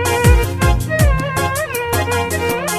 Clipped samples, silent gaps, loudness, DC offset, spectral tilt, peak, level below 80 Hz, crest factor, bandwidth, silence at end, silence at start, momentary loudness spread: under 0.1%; none; -16 LUFS; under 0.1%; -5 dB/octave; 0 dBFS; -20 dBFS; 14 dB; 16 kHz; 0 s; 0 s; 5 LU